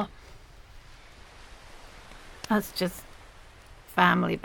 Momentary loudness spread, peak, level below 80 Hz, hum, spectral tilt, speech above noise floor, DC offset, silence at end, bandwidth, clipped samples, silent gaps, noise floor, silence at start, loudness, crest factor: 28 LU; -6 dBFS; -52 dBFS; none; -5 dB/octave; 25 dB; under 0.1%; 0.05 s; 17.5 kHz; under 0.1%; none; -50 dBFS; 0 s; -26 LUFS; 26 dB